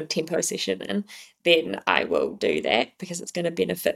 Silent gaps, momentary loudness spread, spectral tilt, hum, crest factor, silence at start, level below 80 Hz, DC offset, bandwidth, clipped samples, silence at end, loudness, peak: none; 10 LU; -3 dB/octave; none; 24 dB; 0 s; -64 dBFS; under 0.1%; 16.5 kHz; under 0.1%; 0 s; -25 LUFS; -2 dBFS